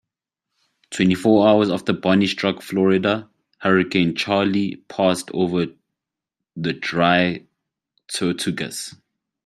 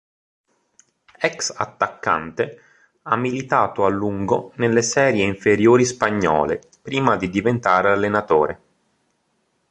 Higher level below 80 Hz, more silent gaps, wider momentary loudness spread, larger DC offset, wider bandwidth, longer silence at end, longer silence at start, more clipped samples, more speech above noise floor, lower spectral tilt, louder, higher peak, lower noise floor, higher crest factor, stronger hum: second, -60 dBFS vs -52 dBFS; neither; first, 12 LU vs 8 LU; neither; first, 14 kHz vs 11 kHz; second, 0.55 s vs 1.15 s; second, 0.9 s vs 1.2 s; neither; first, 65 dB vs 49 dB; about the same, -5.5 dB/octave vs -5 dB/octave; about the same, -20 LUFS vs -19 LUFS; about the same, -2 dBFS vs -2 dBFS; first, -84 dBFS vs -68 dBFS; about the same, 20 dB vs 18 dB; neither